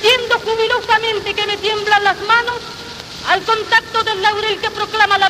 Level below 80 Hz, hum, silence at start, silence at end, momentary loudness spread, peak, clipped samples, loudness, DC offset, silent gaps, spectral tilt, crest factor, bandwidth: -48 dBFS; none; 0 s; 0 s; 9 LU; 0 dBFS; under 0.1%; -15 LUFS; under 0.1%; none; -2 dB/octave; 16 dB; 15 kHz